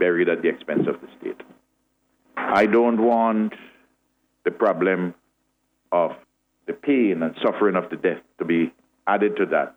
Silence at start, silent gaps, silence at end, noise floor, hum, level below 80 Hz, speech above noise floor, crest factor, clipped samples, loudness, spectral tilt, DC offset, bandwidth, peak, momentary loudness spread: 0 s; none; 0.05 s; -71 dBFS; none; -68 dBFS; 50 dB; 16 dB; under 0.1%; -22 LUFS; -8 dB/octave; under 0.1%; 7.2 kHz; -6 dBFS; 16 LU